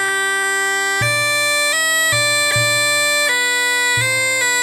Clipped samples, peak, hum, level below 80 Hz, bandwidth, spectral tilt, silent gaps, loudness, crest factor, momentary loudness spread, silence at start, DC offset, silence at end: under 0.1%; -2 dBFS; none; -54 dBFS; 17 kHz; -0.5 dB/octave; none; -14 LUFS; 14 dB; 3 LU; 0 s; under 0.1%; 0 s